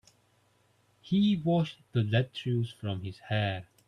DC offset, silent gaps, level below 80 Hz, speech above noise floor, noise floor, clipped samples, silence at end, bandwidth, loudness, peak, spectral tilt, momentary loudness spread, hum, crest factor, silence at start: under 0.1%; none; -66 dBFS; 39 dB; -68 dBFS; under 0.1%; 0.25 s; 10.5 kHz; -30 LUFS; -12 dBFS; -8 dB/octave; 9 LU; none; 18 dB; 1.05 s